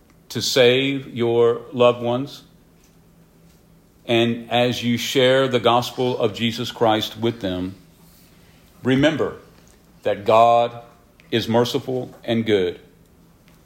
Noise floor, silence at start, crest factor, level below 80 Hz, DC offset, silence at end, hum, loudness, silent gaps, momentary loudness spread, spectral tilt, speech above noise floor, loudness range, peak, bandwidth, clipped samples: -53 dBFS; 0.3 s; 18 dB; -56 dBFS; under 0.1%; 0.9 s; none; -20 LUFS; none; 12 LU; -5 dB/octave; 33 dB; 4 LU; -2 dBFS; 16.5 kHz; under 0.1%